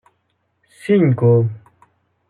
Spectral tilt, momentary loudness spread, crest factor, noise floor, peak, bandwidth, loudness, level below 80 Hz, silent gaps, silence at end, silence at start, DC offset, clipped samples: -9.5 dB/octave; 18 LU; 14 dB; -68 dBFS; -4 dBFS; 11 kHz; -16 LUFS; -64 dBFS; none; 0.7 s; 0.85 s; under 0.1%; under 0.1%